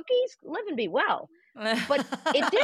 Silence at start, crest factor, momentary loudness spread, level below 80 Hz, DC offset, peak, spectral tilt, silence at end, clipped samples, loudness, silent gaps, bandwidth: 0.05 s; 16 dB; 8 LU; -78 dBFS; under 0.1%; -10 dBFS; -3.5 dB/octave; 0 s; under 0.1%; -28 LUFS; none; 14 kHz